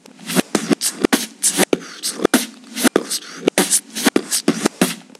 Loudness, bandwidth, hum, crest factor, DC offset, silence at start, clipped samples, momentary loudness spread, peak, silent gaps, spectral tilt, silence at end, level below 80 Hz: -18 LUFS; 16 kHz; none; 20 dB; under 0.1%; 0.2 s; under 0.1%; 5 LU; 0 dBFS; none; -2.5 dB/octave; 0.15 s; -60 dBFS